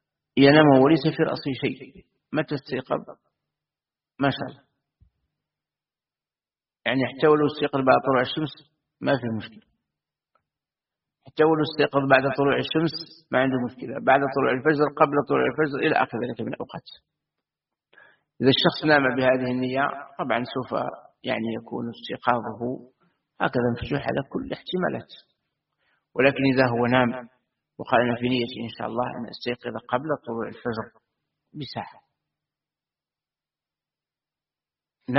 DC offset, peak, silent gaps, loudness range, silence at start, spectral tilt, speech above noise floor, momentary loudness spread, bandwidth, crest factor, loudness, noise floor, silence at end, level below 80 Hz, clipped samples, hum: under 0.1%; -2 dBFS; none; 11 LU; 0.35 s; -4 dB/octave; over 67 dB; 14 LU; 5.8 kHz; 24 dB; -23 LUFS; under -90 dBFS; 0 s; -60 dBFS; under 0.1%; none